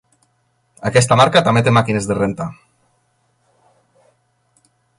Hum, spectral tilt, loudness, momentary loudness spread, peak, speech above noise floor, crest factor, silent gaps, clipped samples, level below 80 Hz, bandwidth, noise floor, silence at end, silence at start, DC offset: none; -5 dB/octave; -15 LUFS; 15 LU; 0 dBFS; 49 dB; 18 dB; none; under 0.1%; -50 dBFS; 11.5 kHz; -64 dBFS; 2.45 s; 0.8 s; under 0.1%